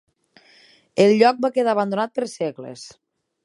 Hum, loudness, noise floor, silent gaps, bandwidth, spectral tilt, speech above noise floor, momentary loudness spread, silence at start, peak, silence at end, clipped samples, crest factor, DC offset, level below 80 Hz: none; -20 LUFS; -55 dBFS; none; 11.5 kHz; -5.5 dB/octave; 36 dB; 22 LU; 0.95 s; -2 dBFS; 0.55 s; under 0.1%; 20 dB; under 0.1%; -72 dBFS